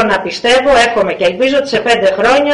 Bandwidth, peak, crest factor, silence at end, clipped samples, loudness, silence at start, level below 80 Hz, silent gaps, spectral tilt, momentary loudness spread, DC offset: 11 kHz; -2 dBFS; 8 dB; 0 s; under 0.1%; -11 LUFS; 0 s; -40 dBFS; none; -3.5 dB/octave; 5 LU; under 0.1%